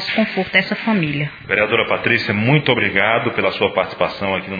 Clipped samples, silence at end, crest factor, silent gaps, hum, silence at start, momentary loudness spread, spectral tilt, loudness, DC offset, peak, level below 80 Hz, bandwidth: under 0.1%; 0 s; 18 dB; none; none; 0 s; 6 LU; -7.5 dB/octave; -17 LUFS; under 0.1%; 0 dBFS; -52 dBFS; 5 kHz